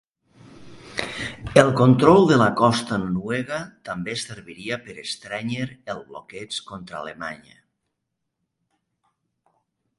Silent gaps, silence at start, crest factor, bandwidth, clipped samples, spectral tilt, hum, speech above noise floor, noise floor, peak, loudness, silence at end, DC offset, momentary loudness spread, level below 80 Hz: none; 0.6 s; 22 dB; 11.5 kHz; under 0.1%; -6 dB/octave; none; 58 dB; -80 dBFS; 0 dBFS; -21 LUFS; 2.65 s; under 0.1%; 20 LU; -52 dBFS